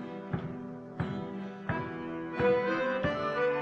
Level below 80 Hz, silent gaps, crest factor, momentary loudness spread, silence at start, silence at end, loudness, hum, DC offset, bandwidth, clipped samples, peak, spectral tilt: -56 dBFS; none; 16 dB; 12 LU; 0 s; 0 s; -33 LUFS; none; under 0.1%; 6.8 kHz; under 0.1%; -16 dBFS; -7.5 dB/octave